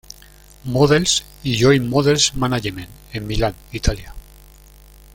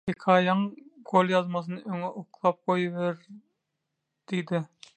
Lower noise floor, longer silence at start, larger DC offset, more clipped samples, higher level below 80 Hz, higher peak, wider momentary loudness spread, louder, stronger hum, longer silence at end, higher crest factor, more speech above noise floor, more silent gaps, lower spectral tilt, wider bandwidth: second, -45 dBFS vs -82 dBFS; first, 0.65 s vs 0.05 s; neither; neither; first, -32 dBFS vs -72 dBFS; first, -2 dBFS vs -6 dBFS; first, 16 LU vs 11 LU; first, -18 LUFS vs -27 LUFS; first, 50 Hz at -40 dBFS vs none; first, 0.95 s vs 0.3 s; about the same, 18 dB vs 22 dB; second, 27 dB vs 55 dB; neither; second, -4.5 dB/octave vs -7 dB/octave; first, 17 kHz vs 8.8 kHz